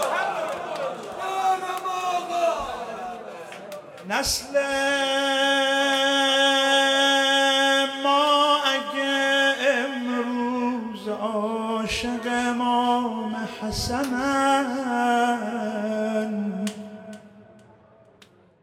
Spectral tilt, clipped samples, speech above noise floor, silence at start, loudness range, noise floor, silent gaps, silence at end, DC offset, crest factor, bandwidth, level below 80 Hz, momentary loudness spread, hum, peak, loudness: -2.5 dB/octave; under 0.1%; 31 dB; 0 s; 8 LU; -55 dBFS; none; 1.2 s; under 0.1%; 16 dB; 16 kHz; -52 dBFS; 13 LU; none; -8 dBFS; -23 LUFS